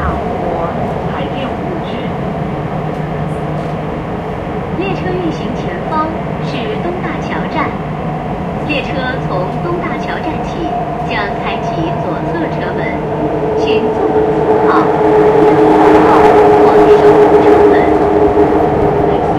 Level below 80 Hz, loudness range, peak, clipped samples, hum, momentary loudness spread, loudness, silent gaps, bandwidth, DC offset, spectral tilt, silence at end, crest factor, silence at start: -32 dBFS; 11 LU; 0 dBFS; 0.2%; none; 12 LU; -13 LUFS; none; 9 kHz; under 0.1%; -7.5 dB/octave; 0 s; 12 dB; 0 s